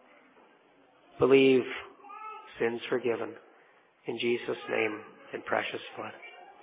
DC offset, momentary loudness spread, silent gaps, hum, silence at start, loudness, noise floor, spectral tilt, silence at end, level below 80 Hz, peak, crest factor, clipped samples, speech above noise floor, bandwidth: under 0.1%; 21 LU; none; none; 1.15 s; -29 LUFS; -62 dBFS; -3.5 dB/octave; 0.1 s; -70 dBFS; -10 dBFS; 20 dB; under 0.1%; 33 dB; 4 kHz